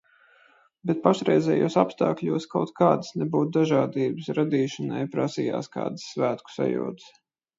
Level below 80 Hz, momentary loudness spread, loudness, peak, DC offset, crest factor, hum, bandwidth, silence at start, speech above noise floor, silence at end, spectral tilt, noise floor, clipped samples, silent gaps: -70 dBFS; 9 LU; -25 LUFS; -4 dBFS; under 0.1%; 22 dB; none; 7.8 kHz; 0.85 s; 35 dB; 0.5 s; -7 dB/octave; -59 dBFS; under 0.1%; none